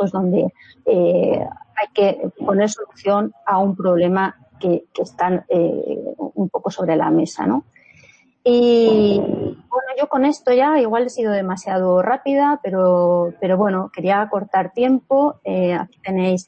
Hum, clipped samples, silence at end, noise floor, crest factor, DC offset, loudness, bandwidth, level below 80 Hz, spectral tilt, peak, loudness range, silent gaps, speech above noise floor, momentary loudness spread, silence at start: none; under 0.1%; 0.05 s; -51 dBFS; 16 dB; under 0.1%; -18 LUFS; 8.6 kHz; -60 dBFS; -6.5 dB/octave; -2 dBFS; 3 LU; none; 33 dB; 9 LU; 0 s